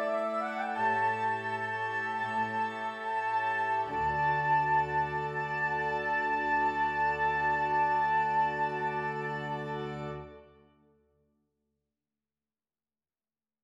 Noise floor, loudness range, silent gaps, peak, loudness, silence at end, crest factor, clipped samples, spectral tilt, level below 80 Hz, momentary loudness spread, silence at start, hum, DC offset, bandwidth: under -90 dBFS; 11 LU; none; -18 dBFS; -30 LUFS; 3.2 s; 14 dB; under 0.1%; -6 dB/octave; -60 dBFS; 8 LU; 0 s; none; under 0.1%; 8.4 kHz